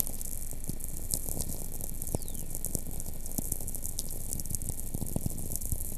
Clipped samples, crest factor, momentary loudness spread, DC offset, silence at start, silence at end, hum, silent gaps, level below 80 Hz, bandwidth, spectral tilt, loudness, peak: under 0.1%; 26 dB; 5 LU; under 0.1%; 0 s; 0 s; none; none; -40 dBFS; 15 kHz; -4 dB/octave; -36 LUFS; -6 dBFS